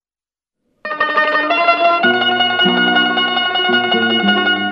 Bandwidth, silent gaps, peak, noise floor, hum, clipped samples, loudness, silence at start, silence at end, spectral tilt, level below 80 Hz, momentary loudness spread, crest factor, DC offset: 6.6 kHz; none; 0 dBFS; under -90 dBFS; none; under 0.1%; -13 LUFS; 0.85 s; 0 s; -5.5 dB/octave; -66 dBFS; 3 LU; 14 dB; under 0.1%